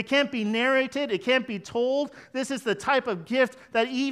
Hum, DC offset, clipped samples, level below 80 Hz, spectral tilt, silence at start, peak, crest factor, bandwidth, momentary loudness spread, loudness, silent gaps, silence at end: none; under 0.1%; under 0.1%; -68 dBFS; -4 dB/octave; 0 s; -10 dBFS; 16 dB; 13 kHz; 6 LU; -26 LUFS; none; 0 s